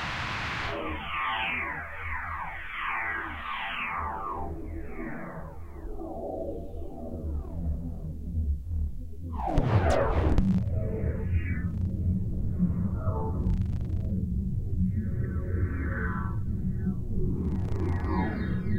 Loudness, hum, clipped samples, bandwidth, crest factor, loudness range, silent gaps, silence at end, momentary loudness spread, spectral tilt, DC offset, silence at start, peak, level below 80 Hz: -31 LUFS; none; under 0.1%; 9 kHz; 18 dB; 8 LU; none; 0 s; 12 LU; -7.5 dB/octave; under 0.1%; 0 s; -10 dBFS; -36 dBFS